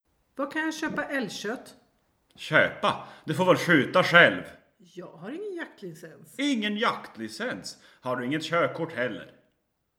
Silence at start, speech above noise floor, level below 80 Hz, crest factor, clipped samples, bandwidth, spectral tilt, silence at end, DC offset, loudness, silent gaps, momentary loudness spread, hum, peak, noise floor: 0.35 s; 48 dB; -72 dBFS; 26 dB; under 0.1%; 16.5 kHz; -4.5 dB/octave; 0.7 s; under 0.1%; -25 LUFS; none; 21 LU; none; -2 dBFS; -75 dBFS